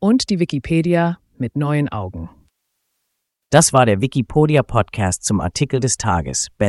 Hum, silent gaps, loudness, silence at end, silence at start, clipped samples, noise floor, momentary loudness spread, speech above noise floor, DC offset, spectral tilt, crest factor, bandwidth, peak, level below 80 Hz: none; none; -18 LUFS; 0 s; 0 s; under 0.1%; -75 dBFS; 11 LU; 58 dB; under 0.1%; -5 dB/octave; 18 dB; 12 kHz; 0 dBFS; -40 dBFS